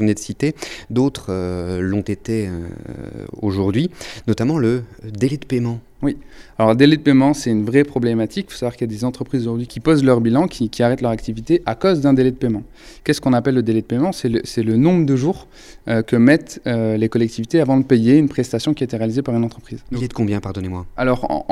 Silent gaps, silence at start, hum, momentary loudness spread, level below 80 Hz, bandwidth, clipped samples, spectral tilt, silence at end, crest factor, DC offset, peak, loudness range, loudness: none; 0 s; none; 12 LU; -42 dBFS; 13.5 kHz; under 0.1%; -7 dB/octave; 0 s; 18 dB; under 0.1%; 0 dBFS; 5 LU; -18 LUFS